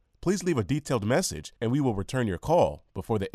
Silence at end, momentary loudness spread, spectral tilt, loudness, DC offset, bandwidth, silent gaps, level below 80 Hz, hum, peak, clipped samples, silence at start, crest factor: 0.05 s; 7 LU; -5.5 dB/octave; -27 LUFS; under 0.1%; 13.5 kHz; none; -50 dBFS; none; -10 dBFS; under 0.1%; 0.2 s; 16 dB